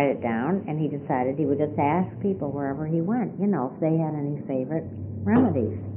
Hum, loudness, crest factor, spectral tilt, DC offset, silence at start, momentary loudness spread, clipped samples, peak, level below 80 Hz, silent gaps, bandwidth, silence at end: none; -26 LUFS; 18 dB; -6 dB/octave; under 0.1%; 0 s; 6 LU; under 0.1%; -8 dBFS; -60 dBFS; none; 3.3 kHz; 0 s